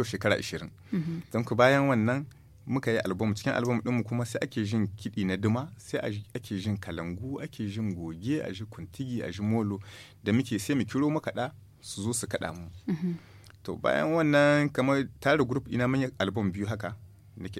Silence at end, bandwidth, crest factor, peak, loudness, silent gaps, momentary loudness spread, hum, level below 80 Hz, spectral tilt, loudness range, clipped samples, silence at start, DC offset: 0 s; 15.5 kHz; 22 dB; -8 dBFS; -29 LUFS; none; 14 LU; none; -60 dBFS; -6 dB/octave; 7 LU; under 0.1%; 0 s; under 0.1%